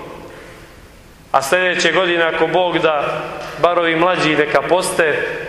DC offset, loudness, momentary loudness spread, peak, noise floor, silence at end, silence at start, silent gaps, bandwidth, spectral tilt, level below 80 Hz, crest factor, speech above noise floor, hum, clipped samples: under 0.1%; -15 LUFS; 10 LU; 0 dBFS; -42 dBFS; 0 s; 0 s; none; 14 kHz; -3.5 dB/octave; -48 dBFS; 16 dB; 26 dB; none; under 0.1%